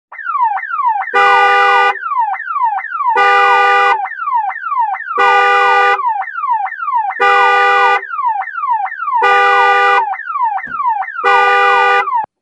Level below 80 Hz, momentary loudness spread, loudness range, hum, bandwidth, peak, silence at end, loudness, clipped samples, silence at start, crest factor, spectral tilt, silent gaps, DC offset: -64 dBFS; 8 LU; 2 LU; none; 10.5 kHz; 0 dBFS; 0.15 s; -12 LUFS; under 0.1%; 0.1 s; 12 dB; -1 dB/octave; none; under 0.1%